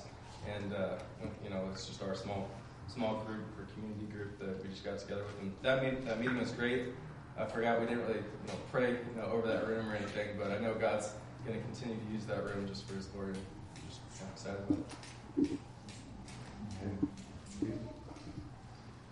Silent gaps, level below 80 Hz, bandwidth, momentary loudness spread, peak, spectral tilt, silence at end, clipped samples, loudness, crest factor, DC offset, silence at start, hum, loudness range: none; -60 dBFS; 11.5 kHz; 15 LU; -18 dBFS; -6 dB/octave; 0 s; under 0.1%; -39 LUFS; 22 dB; under 0.1%; 0 s; none; 6 LU